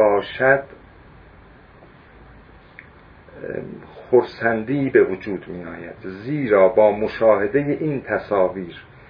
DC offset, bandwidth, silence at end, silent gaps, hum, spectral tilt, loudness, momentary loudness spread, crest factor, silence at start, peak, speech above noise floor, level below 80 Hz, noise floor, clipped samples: under 0.1%; 5.2 kHz; 0.25 s; none; none; -9.5 dB/octave; -19 LUFS; 18 LU; 18 dB; 0 s; -2 dBFS; 27 dB; -52 dBFS; -47 dBFS; under 0.1%